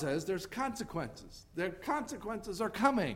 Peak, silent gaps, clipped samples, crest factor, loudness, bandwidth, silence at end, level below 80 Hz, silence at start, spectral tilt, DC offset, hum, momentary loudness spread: -14 dBFS; none; under 0.1%; 22 dB; -36 LUFS; 16 kHz; 0 s; -58 dBFS; 0 s; -5 dB/octave; under 0.1%; none; 11 LU